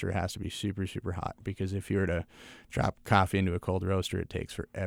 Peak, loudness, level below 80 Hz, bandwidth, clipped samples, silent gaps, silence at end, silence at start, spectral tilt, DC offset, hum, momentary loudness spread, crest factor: -10 dBFS; -32 LUFS; -50 dBFS; 16 kHz; under 0.1%; none; 0 s; 0 s; -6 dB/octave; under 0.1%; none; 11 LU; 22 dB